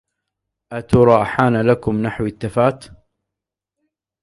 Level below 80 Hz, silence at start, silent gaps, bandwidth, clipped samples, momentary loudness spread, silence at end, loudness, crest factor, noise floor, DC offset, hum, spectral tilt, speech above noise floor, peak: -44 dBFS; 0.7 s; none; 11.5 kHz; under 0.1%; 16 LU; 1.4 s; -17 LUFS; 18 dB; -84 dBFS; under 0.1%; none; -8 dB/octave; 68 dB; 0 dBFS